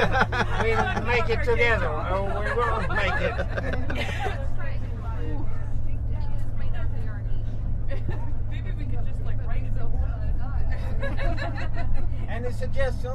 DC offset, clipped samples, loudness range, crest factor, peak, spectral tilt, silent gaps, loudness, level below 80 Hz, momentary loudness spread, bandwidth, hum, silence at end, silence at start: under 0.1%; under 0.1%; 7 LU; 16 dB; -6 dBFS; -6.5 dB/octave; none; -28 LUFS; -26 dBFS; 9 LU; 6.6 kHz; none; 0 s; 0 s